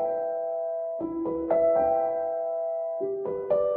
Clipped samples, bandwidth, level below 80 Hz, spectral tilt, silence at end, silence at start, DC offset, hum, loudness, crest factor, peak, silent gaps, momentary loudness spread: under 0.1%; 3.2 kHz; -60 dBFS; -10.5 dB/octave; 0 s; 0 s; under 0.1%; none; -28 LUFS; 14 dB; -14 dBFS; none; 8 LU